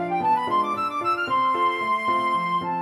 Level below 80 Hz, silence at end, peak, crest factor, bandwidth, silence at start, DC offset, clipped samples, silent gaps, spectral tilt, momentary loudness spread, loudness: -64 dBFS; 0 s; -12 dBFS; 10 dB; 13 kHz; 0 s; under 0.1%; under 0.1%; none; -5 dB/octave; 3 LU; -23 LUFS